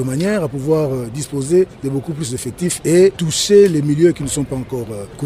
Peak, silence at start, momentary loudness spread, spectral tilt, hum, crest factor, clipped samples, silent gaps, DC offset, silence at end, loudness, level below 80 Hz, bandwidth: -2 dBFS; 0 s; 12 LU; -5.5 dB/octave; none; 14 dB; under 0.1%; none; under 0.1%; 0 s; -16 LUFS; -44 dBFS; 16 kHz